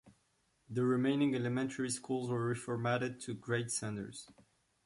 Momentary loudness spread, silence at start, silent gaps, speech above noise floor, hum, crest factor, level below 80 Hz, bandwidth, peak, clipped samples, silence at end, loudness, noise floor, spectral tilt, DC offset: 11 LU; 0.05 s; none; 41 dB; none; 16 dB; -72 dBFS; 11.5 kHz; -22 dBFS; under 0.1%; 0.45 s; -36 LUFS; -76 dBFS; -5.5 dB/octave; under 0.1%